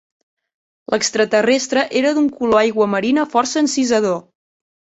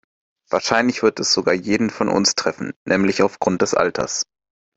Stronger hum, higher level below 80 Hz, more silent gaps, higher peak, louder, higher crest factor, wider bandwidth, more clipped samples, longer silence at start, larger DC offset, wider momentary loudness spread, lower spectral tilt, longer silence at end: neither; about the same, -58 dBFS vs -56 dBFS; second, none vs 2.76-2.86 s; about the same, -2 dBFS vs 0 dBFS; about the same, -17 LUFS vs -19 LUFS; about the same, 16 dB vs 20 dB; about the same, 8.4 kHz vs 8.4 kHz; neither; first, 0.9 s vs 0.5 s; neither; second, 4 LU vs 8 LU; about the same, -3.5 dB/octave vs -3.5 dB/octave; first, 0.75 s vs 0.55 s